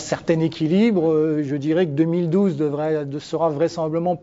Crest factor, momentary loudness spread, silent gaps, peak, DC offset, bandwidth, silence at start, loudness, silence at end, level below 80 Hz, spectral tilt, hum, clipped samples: 14 dB; 5 LU; none; -6 dBFS; under 0.1%; 7.8 kHz; 0 s; -21 LUFS; 0.05 s; -58 dBFS; -7.5 dB/octave; none; under 0.1%